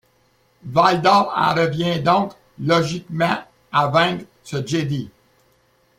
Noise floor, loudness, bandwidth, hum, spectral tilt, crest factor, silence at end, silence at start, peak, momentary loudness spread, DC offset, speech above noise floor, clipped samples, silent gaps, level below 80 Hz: -60 dBFS; -19 LUFS; 15.5 kHz; none; -5.5 dB/octave; 18 dB; 0.9 s; 0.65 s; -2 dBFS; 13 LU; under 0.1%; 42 dB; under 0.1%; none; -56 dBFS